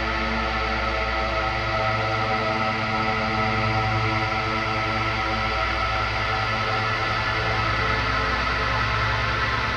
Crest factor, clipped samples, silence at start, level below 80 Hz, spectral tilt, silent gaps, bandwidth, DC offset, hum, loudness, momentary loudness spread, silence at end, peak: 12 dB; under 0.1%; 0 s; -34 dBFS; -5 dB/octave; none; 10.5 kHz; under 0.1%; none; -23 LUFS; 2 LU; 0 s; -10 dBFS